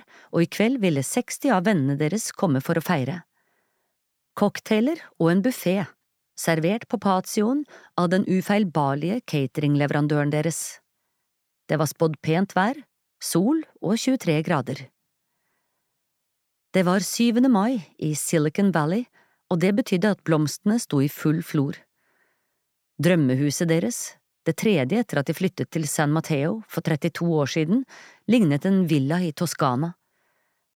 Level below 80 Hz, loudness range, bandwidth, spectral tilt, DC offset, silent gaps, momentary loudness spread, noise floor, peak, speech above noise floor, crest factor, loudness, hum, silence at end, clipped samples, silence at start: -72 dBFS; 3 LU; 17.5 kHz; -6 dB/octave; under 0.1%; none; 8 LU; -77 dBFS; -6 dBFS; 55 dB; 18 dB; -23 LUFS; none; 0.85 s; under 0.1%; 0.35 s